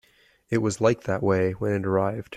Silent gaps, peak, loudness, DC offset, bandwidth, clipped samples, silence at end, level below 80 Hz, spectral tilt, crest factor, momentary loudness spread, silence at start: none; -8 dBFS; -25 LUFS; under 0.1%; 13 kHz; under 0.1%; 0 s; -58 dBFS; -6.5 dB/octave; 18 dB; 4 LU; 0.5 s